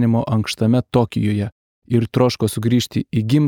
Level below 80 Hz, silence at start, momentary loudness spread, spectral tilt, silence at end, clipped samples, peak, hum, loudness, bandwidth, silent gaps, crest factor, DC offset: -50 dBFS; 0 s; 5 LU; -6.5 dB/octave; 0 s; under 0.1%; -2 dBFS; none; -19 LUFS; 17 kHz; 1.52-1.82 s; 16 dB; under 0.1%